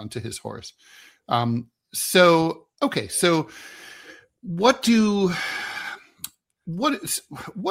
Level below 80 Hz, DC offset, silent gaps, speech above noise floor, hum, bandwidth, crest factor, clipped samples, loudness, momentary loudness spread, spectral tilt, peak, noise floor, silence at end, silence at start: -62 dBFS; under 0.1%; none; 25 dB; none; 16 kHz; 22 dB; under 0.1%; -22 LUFS; 23 LU; -4 dB/octave; -2 dBFS; -47 dBFS; 0 s; 0 s